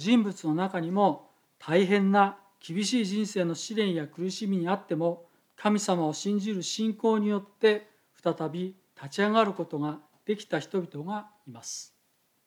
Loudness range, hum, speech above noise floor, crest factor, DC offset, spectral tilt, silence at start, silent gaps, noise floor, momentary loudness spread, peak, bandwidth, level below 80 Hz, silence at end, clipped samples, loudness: 4 LU; none; 43 dB; 20 dB; under 0.1%; -5 dB/octave; 0 s; none; -71 dBFS; 14 LU; -8 dBFS; 12.5 kHz; -90 dBFS; 0.6 s; under 0.1%; -28 LUFS